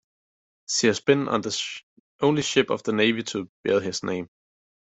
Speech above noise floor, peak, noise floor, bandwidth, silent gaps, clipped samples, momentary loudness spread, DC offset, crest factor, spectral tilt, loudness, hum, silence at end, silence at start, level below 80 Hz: over 66 dB; -4 dBFS; under -90 dBFS; 8.4 kHz; 1.83-2.19 s, 3.49-3.64 s; under 0.1%; 12 LU; under 0.1%; 22 dB; -4 dB/octave; -24 LUFS; none; 0.55 s; 0.7 s; -66 dBFS